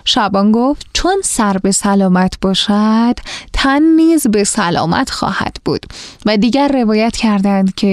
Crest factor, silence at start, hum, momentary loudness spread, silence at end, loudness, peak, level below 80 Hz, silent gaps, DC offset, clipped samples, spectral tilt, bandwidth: 12 dB; 0.05 s; none; 8 LU; 0 s; -13 LUFS; 0 dBFS; -34 dBFS; none; 0.1%; under 0.1%; -4.5 dB/octave; 13.5 kHz